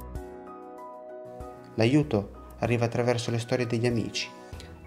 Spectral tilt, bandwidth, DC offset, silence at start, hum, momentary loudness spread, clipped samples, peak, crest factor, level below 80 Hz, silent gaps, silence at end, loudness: -6 dB/octave; 13 kHz; under 0.1%; 0 s; none; 19 LU; under 0.1%; -8 dBFS; 22 dB; -50 dBFS; none; 0 s; -28 LUFS